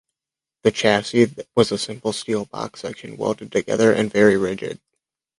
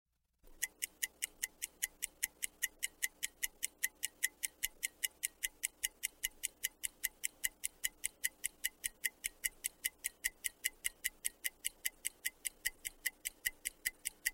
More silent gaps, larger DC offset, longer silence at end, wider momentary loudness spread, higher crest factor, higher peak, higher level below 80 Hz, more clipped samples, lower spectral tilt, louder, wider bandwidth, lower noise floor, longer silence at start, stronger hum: neither; neither; first, 0.65 s vs 0 s; first, 14 LU vs 2 LU; second, 20 dB vs 30 dB; first, -2 dBFS vs -14 dBFS; first, -56 dBFS vs -68 dBFS; neither; first, -5 dB/octave vs 3 dB/octave; first, -20 LUFS vs -40 LUFS; second, 11.5 kHz vs 16.5 kHz; first, -89 dBFS vs -64 dBFS; first, 0.65 s vs 0.45 s; neither